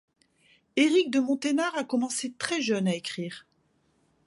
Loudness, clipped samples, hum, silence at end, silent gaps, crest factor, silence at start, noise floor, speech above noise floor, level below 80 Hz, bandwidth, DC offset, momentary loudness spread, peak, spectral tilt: -27 LUFS; under 0.1%; none; 0.85 s; none; 18 dB; 0.75 s; -69 dBFS; 43 dB; -76 dBFS; 11.5 kHz; under 0.1%; 12 LU; -10 dBFS; -4 dB/octave